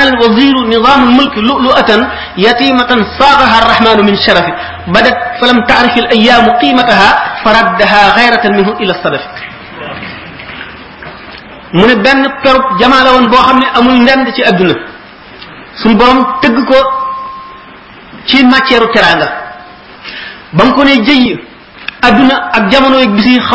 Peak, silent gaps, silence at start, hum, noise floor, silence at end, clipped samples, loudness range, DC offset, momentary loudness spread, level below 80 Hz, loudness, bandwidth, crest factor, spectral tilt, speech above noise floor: 0 dBFS; none; 0 s; none; -32 dBFS; 0 s; 2%; 5 LU; under 0.1%; 19 LU; -34 dBFS; -7 LUFS; 8 kHz; 8 dB; -5.5 dB/octave; 25 dB